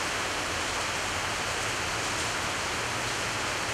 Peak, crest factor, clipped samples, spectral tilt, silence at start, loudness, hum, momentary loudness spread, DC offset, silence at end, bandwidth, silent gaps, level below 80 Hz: -18 dBFS; 14 dB; under 0.1%; -2 dB/octave; 0 s; -29 LUFS; none; 1 LU; under 0.1%; 0 s; 16 kHz; none; -50 dBFS